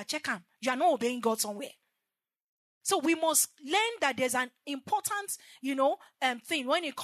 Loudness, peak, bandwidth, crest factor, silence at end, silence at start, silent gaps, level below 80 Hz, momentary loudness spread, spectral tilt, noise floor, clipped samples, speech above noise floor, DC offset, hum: -30 LUFS; -10 dBFS; 13.5 kHz; 22 dB; 0 s; 0 s; 2.41-2.81 s; under -90 dBFS; 9 LU; -1.5 dB/octave; -90 dBFS; under 0.1%; 59 dB; under 0.1%; none